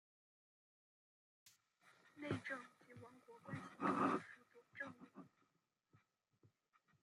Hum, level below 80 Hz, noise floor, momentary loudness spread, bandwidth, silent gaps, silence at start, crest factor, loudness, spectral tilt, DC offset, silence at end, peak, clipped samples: none; -88 dBFS; -86 dBFS; 23 LU; 13 kHz; none; 1.45 s; 24 dB; -45 LUFS; -6.5 dB/octave; under 0.1%; 1.75 s; -26 dBFS; under 0.1%